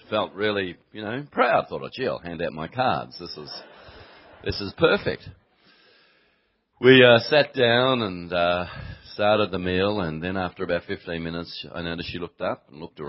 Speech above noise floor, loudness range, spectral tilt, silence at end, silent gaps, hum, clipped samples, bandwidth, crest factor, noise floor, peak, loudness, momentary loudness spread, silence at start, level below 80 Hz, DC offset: 45 dB; 9 LU; -9 dB/octave; 0 s; none; none; under 0.1%; 5.8 kHz; 22 dB; -68 dBFS; -2 dBFS; -23 LUFS; 17 LU; 0.1 s; -50 dBFS; under 0.1%